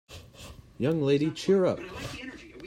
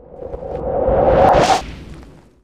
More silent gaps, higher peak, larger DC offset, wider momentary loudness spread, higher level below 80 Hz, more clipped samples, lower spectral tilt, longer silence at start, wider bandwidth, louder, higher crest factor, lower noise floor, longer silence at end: neither; second, -14 dBFS vs 0 dBFS; neither; about the same, 22 LU vs 21 LU; second, -56 dBFS vs -30 dBFS; neither; about the same, -6.5 dB/octave vs -5.5 dB/octave; about the same, 0.1 s vs 0.1 s; first, 15.5 kHz vs 14 kHz; second, -28 LUFS vs -15 LUFS; about the same, 16 dB vs 16 dB; first, -48 dBFS vs -40 dBFS; second, 0 s vs 0.4 s